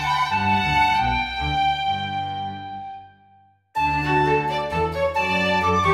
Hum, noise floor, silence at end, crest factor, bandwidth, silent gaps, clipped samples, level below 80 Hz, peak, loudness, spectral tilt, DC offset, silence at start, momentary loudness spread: 50 Hz at -60 dBFS; -56 dBFS; 0 s; 14 dB; 15.5 kHz; none; under 0.1%; -40 dBFS; -8 dBFS; -21 LUFS; -5 dB/octave; under 0.1%; 0 s; 12 LU